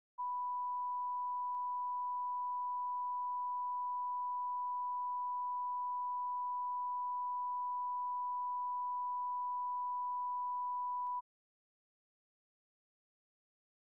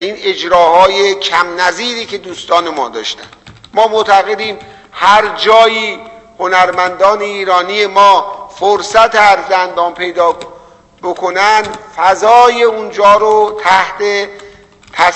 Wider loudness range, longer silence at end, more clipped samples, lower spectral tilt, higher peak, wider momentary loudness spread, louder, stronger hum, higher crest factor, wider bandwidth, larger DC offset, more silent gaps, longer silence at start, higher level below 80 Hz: about the same, 4 LU vs 4 LU; first, 2.8 s vs 0 s; second, under 0.1% vs 0.9%; second, 3.5 dB/octave vs -2 dB/octave; second, -36 dBFS vs 0 dBFS; second, 0 LU vs 14 LU; second, -39 LUFS vs -10 LUFS; neither; second, 4 dB vs 10 dB; second, 1.1 kHz vs 11 kHz; neither; neither; first, 0.2 s vs 0 s; second, under -90 dBFS vs -48 dBFS